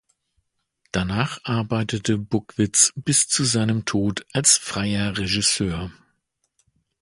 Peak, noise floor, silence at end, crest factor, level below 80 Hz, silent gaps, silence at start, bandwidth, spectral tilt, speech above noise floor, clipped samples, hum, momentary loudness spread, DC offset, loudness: -2 dBFS; -72 dBFS; 1.1 s; 22 dB; -46 dBFS; none; 0.95 s; 11.5 kHz; -3 dB/octave; 50 dB; under 0.1%; none; 10 LU; under 0.1%; -21 LUFS